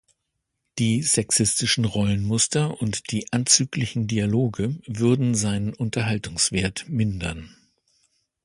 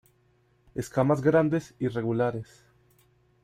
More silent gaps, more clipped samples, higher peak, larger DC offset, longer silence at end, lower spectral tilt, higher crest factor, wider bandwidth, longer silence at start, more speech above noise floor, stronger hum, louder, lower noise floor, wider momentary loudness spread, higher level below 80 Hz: neither; neither; first, -2 dBFS vs -10 dBFS; neither; about the same, 0.95 s vs 1 s; second, -4 dB/octave vs -8 dB/octave; about the same, 22 dB vs 18 dB; second, 11.5 kHz vs 15.5 kHz; about the same, 0.75 s vs 0.75 s; first, 56 dB vs 40 dB; neither; first, -22 LUFS vs -26 LUFS; first, -79 dBFS vs -66 dBFS; second, 9 LU vs 17 LU; first, -46 dBFS vs -60 dBFS